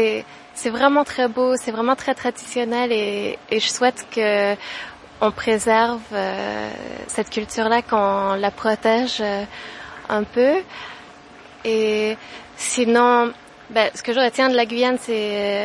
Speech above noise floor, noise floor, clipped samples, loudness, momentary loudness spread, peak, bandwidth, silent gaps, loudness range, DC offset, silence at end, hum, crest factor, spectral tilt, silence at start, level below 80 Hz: 23 dB; -43 dBFS; under 0.1%; -20 LUFS; 14 LU; 0 dBFS; 11.5 kHz; none; 3 LU; under 0.1%; 0 s; none; 20 dB; -3 dB/octave; 0 s; -58 dBFS